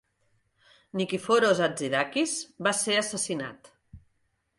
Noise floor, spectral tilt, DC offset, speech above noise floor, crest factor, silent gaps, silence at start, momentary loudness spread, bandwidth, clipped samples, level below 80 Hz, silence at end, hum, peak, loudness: -74 dBFS; -3 dB/octave; under 0.1%; 47 dB; 20 dB; none; 0.95 s; 10 LU; 11.5 kHz; under 0.1%; -66 dBFS; 0.6 s; none; -10 dBFS; -27 LUFS